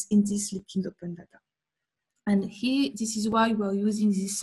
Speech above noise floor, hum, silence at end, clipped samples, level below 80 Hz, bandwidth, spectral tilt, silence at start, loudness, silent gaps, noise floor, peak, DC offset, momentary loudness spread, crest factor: 61 dB; none; 0 s; under 0.1%; -64 dBFS; 12.5 kHz; -5 dB/octave; 0 s; -27 LUFS; none; -88 dBFS; -10 dBFS; under 0.1%; 12 LU; 16 dB